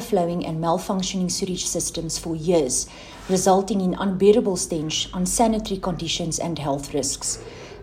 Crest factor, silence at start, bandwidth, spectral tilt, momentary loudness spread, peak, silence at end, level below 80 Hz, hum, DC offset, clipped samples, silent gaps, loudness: 18 dB; 0 s; 15.5 kHz; -4 dB/octave; 8 LU; -4 dBFS; 0 s; -44 dBFS; none; under 0.1%; under 0.1%; none; -23 LUFS